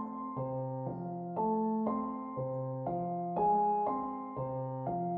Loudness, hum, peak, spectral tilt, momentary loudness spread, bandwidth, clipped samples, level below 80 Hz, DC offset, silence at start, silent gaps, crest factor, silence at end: -35 LUFS; none; -20 dBFS; -11.5 dB/octave; 9 LU; 3.3 kHz; under 0.1%; -66 dBFS; under 0.1%; 0 s; none; 14 dB; 0 s